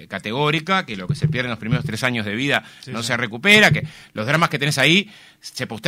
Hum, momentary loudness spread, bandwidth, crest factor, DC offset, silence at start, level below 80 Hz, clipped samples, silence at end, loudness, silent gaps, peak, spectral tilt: none; 16 LU; 16 kHz; 20 dB; under 0.1%; 0 s; -52 dBFS; under 0.1%; 0 s; -18 LUFS; none; 0 dBFS; -4.5 dB/octave